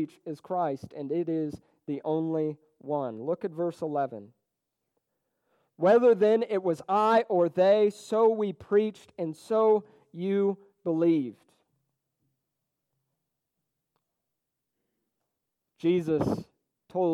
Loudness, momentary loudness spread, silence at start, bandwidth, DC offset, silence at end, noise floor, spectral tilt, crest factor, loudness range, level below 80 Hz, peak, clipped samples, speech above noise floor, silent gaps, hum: -27 LUFS; 14 LU; 0 s; 11.5 kHz; under 0.1%; 0 s; -85 dBFS; -7.5 dB/octave; 18 dB; 10 LU; -68 dBFS; -12 dBFS; under 0.1%; 58 dB; none; none